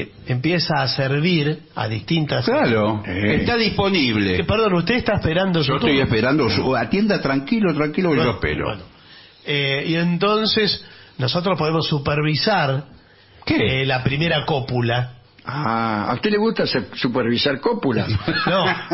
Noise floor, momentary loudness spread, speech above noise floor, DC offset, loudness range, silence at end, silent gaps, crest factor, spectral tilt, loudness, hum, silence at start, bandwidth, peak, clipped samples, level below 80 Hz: -48 dBFS; 6 LU; 29 dB; under 0.1%; 3 LU; 0 s; none; 14 dB; -9 dB/octave; -19 LUFS; none; 0 s; 6 kHz; -6 dBFS; under 0.1%; -44 dBFS